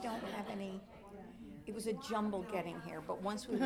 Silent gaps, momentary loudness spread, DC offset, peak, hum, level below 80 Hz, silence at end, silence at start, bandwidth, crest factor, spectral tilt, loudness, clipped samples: none; 15 LU; under 0.1%; -22 dBFS; none; -66 dBFS; 0 s; 0 s; 16.5 kHz; 18 dB; -5.5 dB/octave; -42 LUFS; under 0.1%